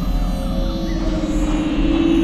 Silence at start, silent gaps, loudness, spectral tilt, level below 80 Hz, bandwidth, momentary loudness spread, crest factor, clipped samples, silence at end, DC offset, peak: 0 s; none; -21 LUFS; -6.5 dB/octave; -22 dBFS; 13 kHz; 6 LU; 12 dB; under 0.1%; 0 s; under 0.1%; -6 dBFS